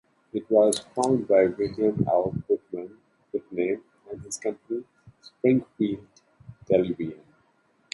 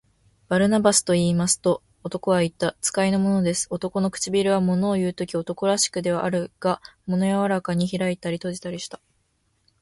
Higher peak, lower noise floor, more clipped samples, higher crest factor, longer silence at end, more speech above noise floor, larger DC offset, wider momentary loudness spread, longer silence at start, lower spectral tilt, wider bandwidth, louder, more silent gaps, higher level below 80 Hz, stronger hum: about the same, -6 dBFS vs -4 dBFS; about the same, -66 dBFS vs -69 dBFS; neither; about the same, 20 dB vs 18 dB; second, 0.8 s vs 0.95 s; second, 42 dB vs 46 dB; neither; first, 15 LU vs 9 LU; second, 0.35 s vs 0.5 s; first, -6 dB/octave vs -4.5 dB/octave; about the same, 11.5 kHz vs 11.5 kHz; second, -26 LUFS vs -23 LUFS; neither; about the same, -60 dBFS vs -56 dBFS; neither